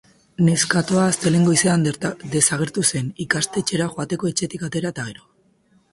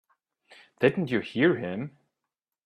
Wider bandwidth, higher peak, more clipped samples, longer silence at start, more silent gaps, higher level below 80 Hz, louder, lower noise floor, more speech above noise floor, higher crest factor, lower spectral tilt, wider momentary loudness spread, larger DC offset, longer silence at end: first, 11.5 kHz vs 9.8 kHz; first, 0 dBFS vs -8 dBFS; neither; second, 0.4 s vs 0.8 s; neither; first, -56 dBFS vs -68 dBFS; first, -20 LUFS vs -27 LUFS; second, -59 dBFS vs -87 dBFS; second, 39 dB vs 61 dB; about the same, 20 dB vs 22 dB; second, -4 dB/octave vs -8 dB/octave; about the same, 10 LU vs 12 LU; neither; about the same, 0.8 s vs 0.75 s